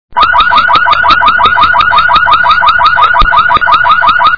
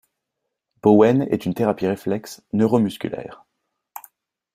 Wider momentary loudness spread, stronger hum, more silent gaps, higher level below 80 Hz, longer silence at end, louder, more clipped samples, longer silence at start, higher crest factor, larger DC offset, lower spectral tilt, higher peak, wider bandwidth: second, 1 LU vs 25 LU; neither; neither; first, -26 dBFS vs -60 dBFS; second, 0 s vs 0.55 s; first, -5 LUFS vs -20 LUFS; first, 3% vs under 0.1%; second, 0.1 s vs 0.85 s; second, 6 dB vs 20 dB; first, 6% vs under 0.1%; second, -3.5 dB/octave vs -7.5 dB/octave; about the same, 0 dBFS vs -2 dBFS; second, 5.4 kHz vs 15.5 kHz